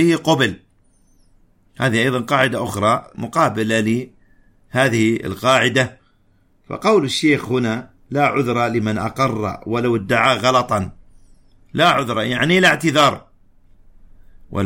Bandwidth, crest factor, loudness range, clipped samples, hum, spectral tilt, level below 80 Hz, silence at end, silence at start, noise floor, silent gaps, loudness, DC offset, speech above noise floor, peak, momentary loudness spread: 16.5 kHz; 16 dB; 2 LU; under 0.1%; none; -5 dB/octave; -50 dBFS; 0 s; 0 s; -57 dBFS; none; -17 LUFS; under 0.1%; 39 dB; -2 dBFS; 10 LU